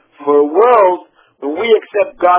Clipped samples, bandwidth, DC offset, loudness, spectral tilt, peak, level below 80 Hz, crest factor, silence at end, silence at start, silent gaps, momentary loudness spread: under 0.1%; 4 kHz; under 0.1%; -12 LUFS; -7.5 dB/octave; 0 dBFS; -60 dBFS; 12 dB; 0 s; 0.2 s; none; 14 LU